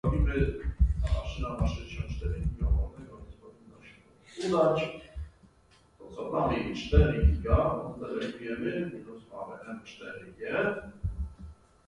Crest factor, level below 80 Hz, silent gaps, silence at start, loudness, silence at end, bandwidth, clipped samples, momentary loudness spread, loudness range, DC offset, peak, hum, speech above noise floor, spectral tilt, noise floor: 22 dB; -34 dBFS; none; 0.05 s; -31 LUFS; 0.35 s; 10 kHz; under 0.1%; 19 LU; 6 LU; under 0.1%; -8 dBFS; none; 33 dB; -7.5 dB/octave; -62 dBFS